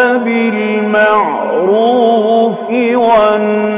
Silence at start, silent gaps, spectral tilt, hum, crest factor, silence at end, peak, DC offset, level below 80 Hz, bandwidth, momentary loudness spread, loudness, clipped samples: 0 s; none; -9.5 dB/octave; none; 10 dB; 0 s; 0 dBFS; under 0.1%; -54 dBFS; 4 kHz; 4 LU; -11 LUFS; under 0.1%